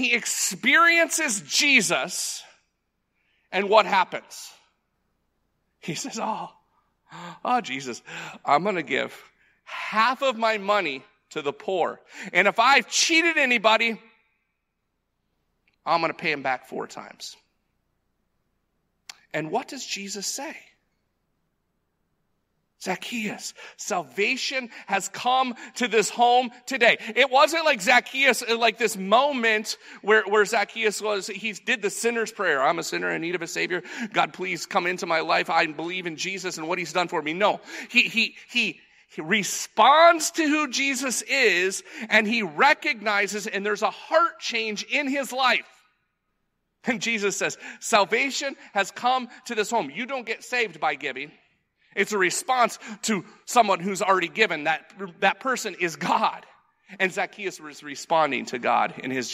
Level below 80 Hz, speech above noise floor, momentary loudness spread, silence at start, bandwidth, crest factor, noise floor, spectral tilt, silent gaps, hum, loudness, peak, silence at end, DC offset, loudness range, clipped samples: -80 dBFS; 53 dB; 14 LU; 0 s; 16 kHz; 22 dB; -77 dBFS; -2 dB/octave; none; none; -23 LUFS; -4 dBFS; 0 s; under 0.1%; 13 LU; under 0.1%